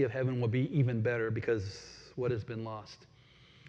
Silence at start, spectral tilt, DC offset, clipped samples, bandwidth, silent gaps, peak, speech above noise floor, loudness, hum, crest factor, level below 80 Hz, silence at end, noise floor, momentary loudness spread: 0 s; -8 dB/octave; under 0.1%; under 0.1%; 7.8 kHz; none; -18 dBFS; 27 dB; -33 LUFS; none; 16 dB; -66 dBFS; 0 s; -60 dBFS; 16 LU